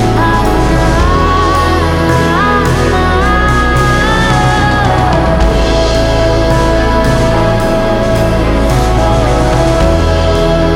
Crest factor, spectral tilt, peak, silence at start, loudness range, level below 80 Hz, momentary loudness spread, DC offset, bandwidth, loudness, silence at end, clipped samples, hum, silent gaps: 8 dB; -6 dB/octave; 0 dBFS; 0 s; 1 LU; -14 dBFS; 1 LU; under 0.1%; 15.5 kHz; -10 LUFS; 0 s; under 0.1%; none; none